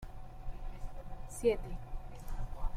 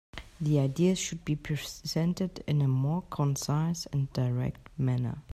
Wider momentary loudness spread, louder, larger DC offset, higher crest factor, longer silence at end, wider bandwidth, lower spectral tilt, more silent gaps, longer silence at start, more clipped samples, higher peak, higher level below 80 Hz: first, 17 LU vs 7 LU; second, -41 LUFS vs -30 LUFS; neither; about the same, 18 dB vs 14 dB; about the same, 0 s vs 0 s; about the same, 14.5 kHz vs 14 kHz; about the same, -6 dB/octave vs -6 dB/octave; neither; second, 0 s vs 0.15 s; neither; second, -18 dBFS vs -14 dBFS; first, -42 dBFS vs -54 dBFS